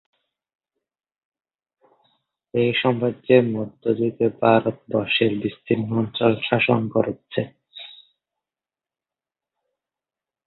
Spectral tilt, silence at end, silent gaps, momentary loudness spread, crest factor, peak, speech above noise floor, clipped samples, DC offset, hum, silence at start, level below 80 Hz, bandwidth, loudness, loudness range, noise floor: -11 dB/octave; 2.55 s; none; 11 LU; 22 dB; -2 dBFS; over 69 dB; under 0.1%; under 0.1%; none; 2.55 s; -62 dBFS; 4.4 kHz; -21 LUFS; 8 LU; under -90 dBFS